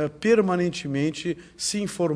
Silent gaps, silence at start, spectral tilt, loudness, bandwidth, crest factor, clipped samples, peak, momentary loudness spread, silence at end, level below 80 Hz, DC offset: none; 0 s; -5 dB/octave; -25 LUFS; 11 kHz; 16 dB; under 0.1%; -8 dBFS; 9 LU; 0 s; -58 dBFS; under 0.1%